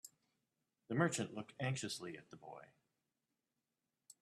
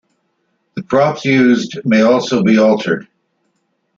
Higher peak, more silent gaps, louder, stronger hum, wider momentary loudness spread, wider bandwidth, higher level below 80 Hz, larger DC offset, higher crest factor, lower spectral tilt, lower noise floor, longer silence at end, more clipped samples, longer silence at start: second, -20 dBFS vs 0 dBFS; neither; second, -41 LUFS vs -13 LUFS; neither; first, 19 LU vs 10 LU; first, 14 kHz vs 7.4 kHz; second, -82 dBFS vs -56 dBFS; neither; first, 26 dB vs 14 dB; second, -4.5 dB/octave vs -6 dB/octave; first, under -90 dBFS vs -65 dBFS; second, 0.1 s vs 0.95 s; neither; second, 0.05 s vs 0.75 s